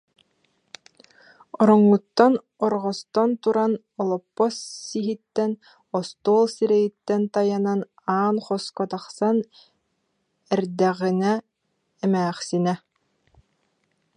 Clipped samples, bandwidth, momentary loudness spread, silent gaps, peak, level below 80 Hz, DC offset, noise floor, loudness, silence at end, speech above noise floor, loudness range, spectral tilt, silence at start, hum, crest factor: under 0.1%; 10.5 kHz; 10 LU; none; -2 dBFS; -72 dBFS; under 0.1%; -74 dBFS; -23 LUFS; 1.4 s; 52 dB; 5 LU; -6.5 dB/octave; 1.6 s; none; 22 dB